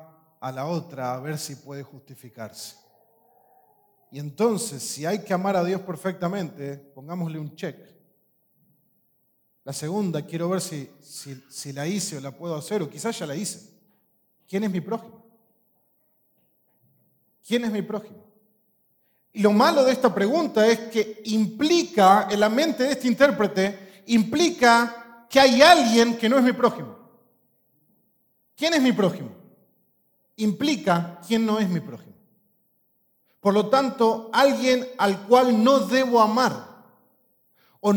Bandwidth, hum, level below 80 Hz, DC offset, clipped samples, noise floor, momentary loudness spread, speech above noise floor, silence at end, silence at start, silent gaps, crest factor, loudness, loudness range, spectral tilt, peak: 19 kHz; none; -68 dBFS; under 0.1%; under 0.1%; -68 dBFS; 20 LU; 46 dB; 0 s; 0.4 s; none; 24 dB; -22 LUFS; 15 LU; -4.5 dB/octave; 0 dBFS